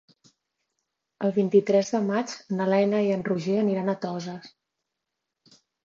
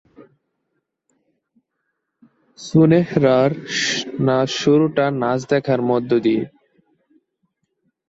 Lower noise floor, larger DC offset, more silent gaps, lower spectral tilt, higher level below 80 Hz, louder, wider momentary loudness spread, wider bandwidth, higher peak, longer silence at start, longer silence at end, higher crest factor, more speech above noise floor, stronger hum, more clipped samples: first, -84 dBFS vs -75 dBFS; neither; neither; about the same, -6.5 dB/octave vs -6 dB/octave; second, -74 dBFS vs -60 dBFS; second, -25 LUFS vs -18 LUFS; first, 11 LU vs 6 LU; about the same, 7.6 kHz vs 8 kHz; second, -8 dBFS vs -2 dBFS; first, 1.2 s vs 0.2 s; second, 1.35 s vs 1.6 s; about the same, 18 dB vs 18 dB; about the same, 60 dB vs 58 dB; neither; neither